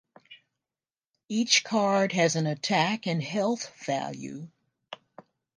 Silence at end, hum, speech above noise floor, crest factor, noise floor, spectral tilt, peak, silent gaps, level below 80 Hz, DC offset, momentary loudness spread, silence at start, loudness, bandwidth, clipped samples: 0.6 s; none; over 63 dB; 22 dB; under -90 dBFS; -3.5 dB/octave; -6 dBFS; none; -76 dBFS; under 0.1%; 22 LU; 0.3 s; -26 LUFS; 10.5 kHz; under 0.1%